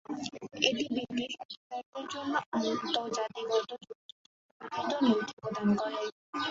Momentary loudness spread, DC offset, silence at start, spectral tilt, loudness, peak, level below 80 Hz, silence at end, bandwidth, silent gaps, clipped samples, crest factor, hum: 13 LU; under 0.1%; 0.1 s; -4 dB/octave; -33 LUFS; -8 dBFS; -72 dBFS; 0 s; 7.8 kHz; 1.45-1.49 s, 1.57-1.70 s, 1.86-1.93 s, 2.46-2.52 s, 3.95-4.60 s, 5.33-5.37 s, 6.12-6.33 s; under 0.1%; 24 dB; none